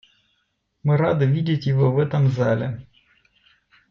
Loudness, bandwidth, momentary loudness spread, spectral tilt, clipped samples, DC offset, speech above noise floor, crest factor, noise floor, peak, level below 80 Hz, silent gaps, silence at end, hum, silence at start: -21 LUFS; 6.4 kHz; 8 LU; -9 dB/octave; under 0.1%; under 0.1%; 52 dB; 14 dB; -71 dBFS; -8 dBFS; -56 dBFS; none; 1.1 s; none; 0.85 s